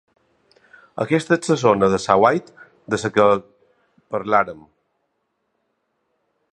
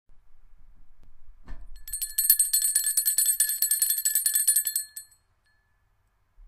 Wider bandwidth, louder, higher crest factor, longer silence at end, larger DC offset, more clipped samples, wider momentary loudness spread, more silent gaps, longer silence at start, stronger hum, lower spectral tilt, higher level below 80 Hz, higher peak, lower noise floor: second, 11 kHz vs 16.5 kHz; first, -19 LUFS vs -22 LUFS; about the same, 22 dB vs 24 dB; first, 1.95 s vs 0 s; neither; neither; about the same, 12 LU vs 12 LU; neither; first, 0.95 s vs 0.1 s; neither; first, -5.5 dB/octave vs 4 dB/octave; second, -56 dBFS vs -50 dBFS; first, 0 dBFS vs -4 dBFS; first, -72 dBFS vs -68 dBFS